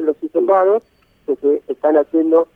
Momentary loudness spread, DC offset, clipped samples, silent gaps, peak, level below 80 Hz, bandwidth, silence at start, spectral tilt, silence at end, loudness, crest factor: 6 LU; under 0.1%; under 0.1%; none; -2 dBFS; -64 dBFS; 3.6 kHz; 0 s; -8 dB/octave; 0.1 s; -16 LUFS; 14 dB